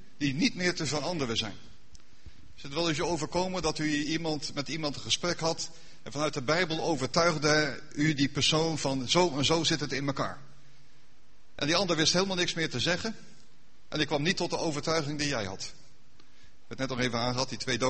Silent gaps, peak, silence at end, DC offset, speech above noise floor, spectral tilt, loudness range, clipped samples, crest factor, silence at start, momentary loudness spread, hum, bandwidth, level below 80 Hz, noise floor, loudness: none; -8 dBFS; 0 s; 0.9%; 34 dB; -3.5 dB/octave; 5 LU; under 0.1%; 22 dB; 0.2 s; 11 LU; none; 8.8 kHz; -54 dBFS; -63 dBFS; -29 LUFS